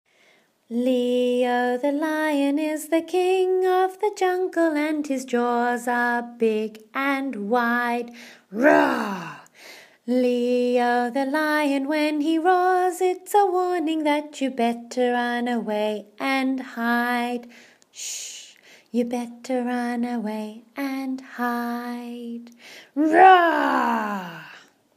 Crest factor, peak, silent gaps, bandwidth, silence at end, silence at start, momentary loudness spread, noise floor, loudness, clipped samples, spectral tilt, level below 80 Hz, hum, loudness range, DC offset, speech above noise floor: 22 dB; -2 dBFS; none; 15.5 kHz; 0.35 s; 0.7 s; 13 LU; -60 dBFS; -22 LUFS; under 0.1%; -4 dB/octave; -80 dBFS; none; 8 LU; under 0.1%; 37 dB